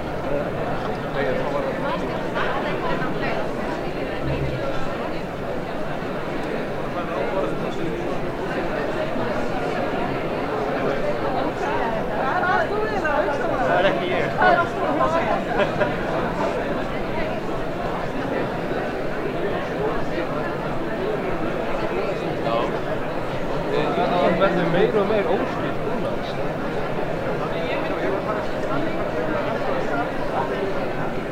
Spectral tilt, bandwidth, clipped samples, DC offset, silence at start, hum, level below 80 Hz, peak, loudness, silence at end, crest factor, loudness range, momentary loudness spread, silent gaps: -6.5 dB/octave; 16 kHz; under 0.1%; under 0.1%; 0 s; none; -38 dBFS; -4 dBFS; -24 LUFS; 0 s; 18 dB; 5 LU; 7 LU; none